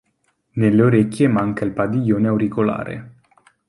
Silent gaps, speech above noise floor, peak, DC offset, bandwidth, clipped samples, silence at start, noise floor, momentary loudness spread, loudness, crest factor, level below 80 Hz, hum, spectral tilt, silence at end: none; 50 dB; -2 dBFS; under 0.1%; 11.5 kHz; under 0.1%; 0.55 s; -67 dBFS; 13 LU; -18 LUFS; 18 dB; -52 dBFS; none; -8.5 dB/octave; 0.6 s